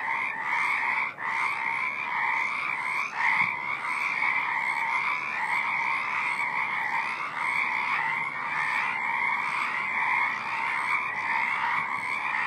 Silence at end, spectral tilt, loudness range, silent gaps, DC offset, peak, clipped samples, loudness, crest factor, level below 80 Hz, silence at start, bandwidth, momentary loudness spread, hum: 0 s; -2 dB/octave; 1 LU; none; under 0.1%; -12 dBFS; under 0.1%; -26 LUFS; 16 dB; -76 dBFS; 0 s; 13.5 kHz; 3 LU; none